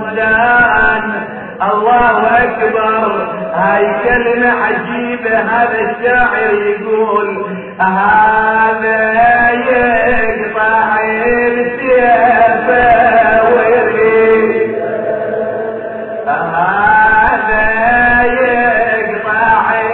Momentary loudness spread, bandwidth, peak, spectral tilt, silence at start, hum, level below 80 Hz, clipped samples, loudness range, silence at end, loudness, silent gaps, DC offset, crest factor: 9 LU; 4.3 kHz; 0 dBFS; -9 dB/octave; 0 s; none; -36 dBFS; under 0.1%; 3 LU; 0 s; -11 LUFS; none; under 0.1%; 10 dB